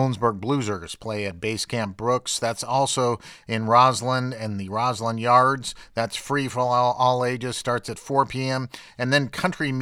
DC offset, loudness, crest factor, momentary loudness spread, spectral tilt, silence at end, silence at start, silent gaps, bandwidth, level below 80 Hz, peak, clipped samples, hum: under 0.1%; -23 LUFS; 20 dB; 11 LU; -4.5 dB/octave; 0 s; 0 s; none; 15.5 kHz; -56 dBFS; -2 dBFS; under 0.1%; none